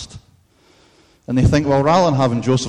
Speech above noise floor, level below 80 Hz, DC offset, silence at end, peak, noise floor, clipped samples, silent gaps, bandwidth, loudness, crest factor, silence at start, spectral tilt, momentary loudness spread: 39 dB; -34 dBFS; under 0.1%; 0 s; -6 dBFS; -54 dBFS; under 0.1%; none; 10.5 kHz; -16 LUFS; 12 dB; 0 s; -6.5 dB/octave; 7 LU